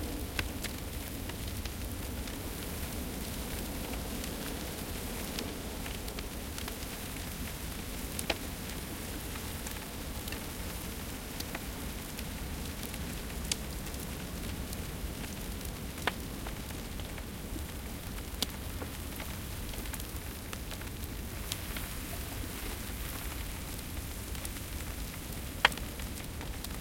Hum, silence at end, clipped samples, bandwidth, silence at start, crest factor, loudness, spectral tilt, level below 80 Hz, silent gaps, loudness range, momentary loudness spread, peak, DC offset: none; 0 s; under 0.1%; 17 kHz; 0 s; 34 dB; -38 LUFS; -3.5 dB/octave; -44 dBFS; none; 2 LU; 5 LU; -6 dBFS; under 0.1%